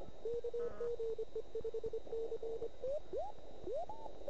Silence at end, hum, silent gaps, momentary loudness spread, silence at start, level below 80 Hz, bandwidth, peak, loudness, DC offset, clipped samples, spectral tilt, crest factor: 0 s; none; none; 4 LU; 0 s; -62 dBFS; 8 kHz; -30 dBFS; -44 LUFS; 0.8%; under 0.1%; -6.5 dB/octave; 12 dB